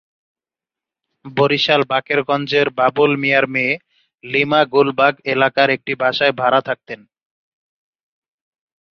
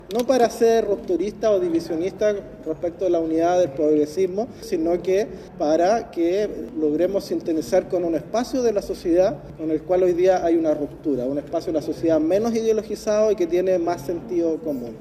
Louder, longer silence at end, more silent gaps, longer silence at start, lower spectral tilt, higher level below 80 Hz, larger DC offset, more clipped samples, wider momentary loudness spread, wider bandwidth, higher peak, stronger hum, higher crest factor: first, -16 LUFS vs -22 LUFS; first, 1.95 s vs 0 s; neither; first, 1.25 s vs 0.05 s; about the same, -6 dB/octave vs -6 dB/octave; second, -64 dBFS vs -50 dBFS; neither; neither; about the same, 8 LU vs 8 LU; second, 6.8 kHz vs 14 kHz; about the same, -2 dBFS vs -4 dBFS; neither; about the same, 18 dB vs 16 dB